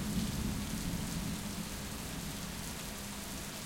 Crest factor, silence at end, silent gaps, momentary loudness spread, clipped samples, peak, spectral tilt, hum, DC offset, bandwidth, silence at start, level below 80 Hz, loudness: 16 dB; 0 s; none; 5 LU; under 0.1%; -22 dBFS; -4 dB/octave; none; under 0.1%; 17 kHz; 0 s; -48 dBFS; -39 LUFS